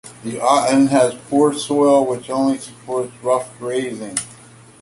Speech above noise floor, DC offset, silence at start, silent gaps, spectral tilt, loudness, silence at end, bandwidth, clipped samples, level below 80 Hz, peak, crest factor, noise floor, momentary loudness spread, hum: 26 dB; under 0.1%; 0.05 s; none; -4.5 dB/octave; -18 LUFS; 0.5 s; 11.5 kHz; under 0.1%; -60 dBFS; -2 dBFS; 16 dB; -44 dBFS; 11 LU; none